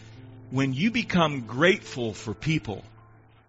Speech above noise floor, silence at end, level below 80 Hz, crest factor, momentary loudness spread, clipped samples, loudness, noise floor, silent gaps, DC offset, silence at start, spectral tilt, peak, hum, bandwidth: 28 dB; 0.6 s; -54 dBFS; 20 dB; 13 LU; under 0.1%; -26 LUFS; -54 dBFS; none; under 0.1%; 0 s; -4.5 dB/octave; -6 dBFS; none; 8 kHz